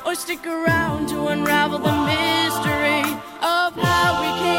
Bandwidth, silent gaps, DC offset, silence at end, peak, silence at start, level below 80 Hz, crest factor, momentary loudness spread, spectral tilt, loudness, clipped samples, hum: 17 kHz; none; under 0.1%; 0 s; -6 dBFS; 0 s; -46 dBFS; 14 dB; 7 LU; -4 dB/octave; -20 LUFS; under 0.1%; none